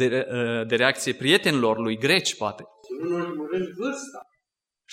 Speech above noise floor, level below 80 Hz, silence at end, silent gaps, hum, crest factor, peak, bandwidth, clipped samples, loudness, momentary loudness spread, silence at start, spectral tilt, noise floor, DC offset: 60 dB; -72 dBFS; 0 s; none; none; 22 dB; -4 dBFS; 16 kHz; under 0.1%; -24 LUFS; 13 LU; 0 s; -4 dB/octave; -84 dBFS; under 0.1%